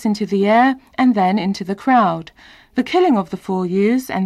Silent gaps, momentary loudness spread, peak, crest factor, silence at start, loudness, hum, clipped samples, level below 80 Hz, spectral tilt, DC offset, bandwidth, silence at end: none; 8 LU; -6 dBFS; 12 dB; 0 s; -17 LUFS; none; under 0.1%; -56 dBFS; -6.5 dB/octave; under 0.1%; 13 kHz; 0 s